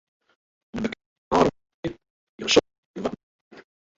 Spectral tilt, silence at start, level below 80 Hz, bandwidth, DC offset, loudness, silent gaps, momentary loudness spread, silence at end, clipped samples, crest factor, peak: -4 dB/octave; 0.75 s; -54 dBFS; 8 kHz; under 0.1%; -25 LUFS; 1.06-1.31 s, 1.74-1.83 s, 2.10-2.38 s, 2.78-2.94 s, 3.23-3.51 s; 19 LU; 0.35 s; under 0.1%; 24 dB; -4 dBFS